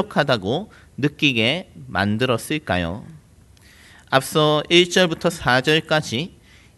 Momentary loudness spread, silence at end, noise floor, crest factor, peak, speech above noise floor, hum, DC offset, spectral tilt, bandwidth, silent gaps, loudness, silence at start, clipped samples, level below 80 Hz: 12 LU; 0.5 s; -50 dBFS; 20 dB; 0 dBFS; 30 dB; none; under 0.1%; -4.5 dB/octave; 12 kHz; none; -19 LUFS; 0 s; under 0.1%; -50 dBFS